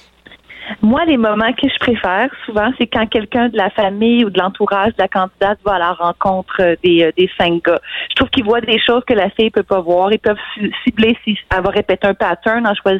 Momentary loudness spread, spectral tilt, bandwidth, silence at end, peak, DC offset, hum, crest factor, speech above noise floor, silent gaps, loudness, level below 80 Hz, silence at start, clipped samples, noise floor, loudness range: 5 LU; -7 dB/octave; 5.8 kHz; 0 s; -2 dBFS; under 0.1%; none; 12 dB; 29 dB; none; -14 LUFS; -40 dBFS; 0.3 s; under 0.1%; -44 dBFS; 1 LU